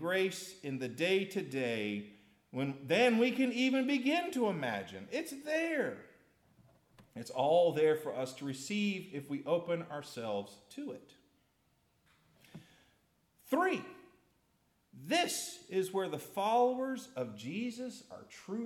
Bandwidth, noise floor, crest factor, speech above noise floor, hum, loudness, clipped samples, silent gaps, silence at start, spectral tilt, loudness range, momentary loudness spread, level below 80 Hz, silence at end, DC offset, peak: 17 kHz; -75 dBFS; 18 dB; 40 dB; none; -34 LUFS; under 0.1%; none; 0 s; -4.5 dB/octave; 9 LU; 16 LU; -82 dBFS; 0 s; under 0.1%; -16 dBFS